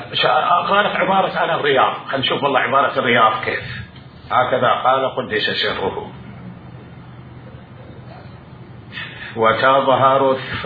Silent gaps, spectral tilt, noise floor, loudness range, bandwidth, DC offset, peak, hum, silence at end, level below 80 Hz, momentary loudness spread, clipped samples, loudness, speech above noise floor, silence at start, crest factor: none; -7.5 dB/octave; -38 dBFS; 13 LU; 5 kHz; under 0.1%; -2 dBFS; none; 0 s; -52 dBFS; 23 LU; under 0.1%; -16 LUFS; 21 dB; 0 s; 16 dB